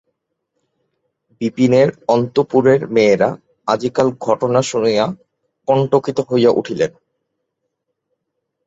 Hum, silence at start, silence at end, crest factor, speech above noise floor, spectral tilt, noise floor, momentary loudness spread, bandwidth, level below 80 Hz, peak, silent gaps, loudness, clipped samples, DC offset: none; 1.4 s; 1.75 s; 16 dB; 60 dB; -6 dB/octave; -75 dBFS; 9 LU; 8 kHz; -58 dBFS; 0 dBFS; none; -16 LUFS; under 0.1%; under 0.1%